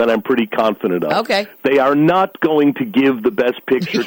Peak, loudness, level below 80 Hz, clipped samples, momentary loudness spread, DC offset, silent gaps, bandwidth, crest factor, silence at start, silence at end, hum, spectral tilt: -4 dBFS; -16 LUFS; -58 dBFS; under 0.1%; 5 LU; under 0.1%; none; 17 kHz; 12 dB; 0 s; 0 s; none; -6.5 dB/octave